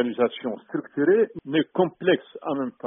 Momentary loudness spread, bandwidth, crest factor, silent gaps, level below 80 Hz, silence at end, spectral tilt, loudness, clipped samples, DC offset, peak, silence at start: 10 LU; 3.8 kHz; 16 dB; none; -68 dBFS; 0 s; -3 dB/octave; -24 LUFS; under 0.1%; under 0.1%; -8 dBFS; 0 s